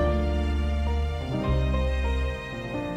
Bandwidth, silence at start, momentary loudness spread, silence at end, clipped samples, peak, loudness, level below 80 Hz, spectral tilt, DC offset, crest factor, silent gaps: 8.8 kHz; 0 s; 6 LU; 0 s; under 0.1%; -12 dBFS; -28 LUFS; -28 dBFS; -7.5 dB/octave; under 0.1%; 12 dB; none